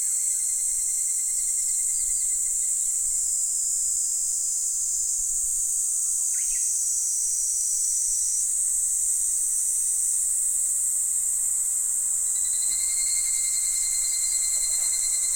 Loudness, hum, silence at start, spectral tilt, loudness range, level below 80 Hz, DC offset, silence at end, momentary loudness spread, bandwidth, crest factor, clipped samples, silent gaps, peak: -22 LUFS; none; 0 s; 4 dB/octave; 1 LU; -54 dBFS; under 0.1%; 0 s; 1 LU; over 20 kHz; 14 dB; under 0.1%; none; -10 dBFS